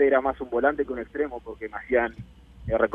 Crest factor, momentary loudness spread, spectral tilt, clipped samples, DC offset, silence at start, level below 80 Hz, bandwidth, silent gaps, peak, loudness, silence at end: 18 dB; 12 LU; -8.5 dB/octave; under 0.1%; under 0.1%; 0 s; -46 dBFS; 3.9 kHz; none; -6 dBFS; -27 LUFS; 0 s